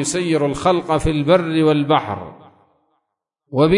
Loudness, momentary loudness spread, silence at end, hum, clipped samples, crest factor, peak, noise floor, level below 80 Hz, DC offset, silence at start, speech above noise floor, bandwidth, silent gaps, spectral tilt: -17 LUFS; 12 LU; 0 s; none; under 0.1%; 14 dB; -4 dBFS; -76 dBFS; -40 dBFS; under 0.1%; 0 s; 59 dB; 11 kHz; none; -5.5 dB/octave